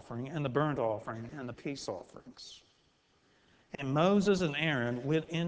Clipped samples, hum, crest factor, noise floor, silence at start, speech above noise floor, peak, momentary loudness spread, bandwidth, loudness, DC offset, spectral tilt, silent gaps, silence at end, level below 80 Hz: under 0.1%; none; 20 dB; -70 dBFS; 0.05 s; 38 dB; -14 dBFS; 21 LU; 8 kHz; -33 LUFS; under 0.1%; -6 dB/octave; none; 0 s; -64 dBFS